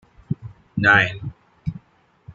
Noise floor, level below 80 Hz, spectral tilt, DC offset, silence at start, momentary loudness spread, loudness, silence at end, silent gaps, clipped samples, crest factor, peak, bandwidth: -58 dBFS; -50 dBFS; -6 dB/octave; under 0.1%; 0.3 s; 19 LU; -19 LUFS; 0 s; none; under 0.1%; 22 dB; -2 dBFS; 7.2 kHz